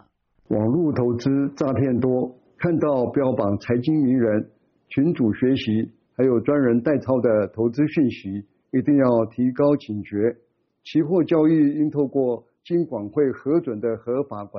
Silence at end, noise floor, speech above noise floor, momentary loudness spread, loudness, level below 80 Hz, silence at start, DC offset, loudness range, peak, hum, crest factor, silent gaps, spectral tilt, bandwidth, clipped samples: 0 s; -59 dBFS; 39 dB; 8 LU; -22 LUFS; -58 dBFS; 0.5 s; under 0.1%; 1 LU; -6 dBFS; none; 14 dB; none; -8 dB/octave; 6.4 kHz; under 0.1%